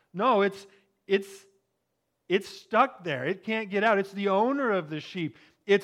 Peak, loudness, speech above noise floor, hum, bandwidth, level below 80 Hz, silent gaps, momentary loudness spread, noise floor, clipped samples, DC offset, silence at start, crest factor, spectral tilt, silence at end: -10 dBFS; -27 LUFS; 52 dB; none; 13 kHz; -82 dBFS; none; 11 LU; -79 dBFS; under 0.1%; under 0.1%; 0.15 s; 18 dB; -6 dB/octave; 0 s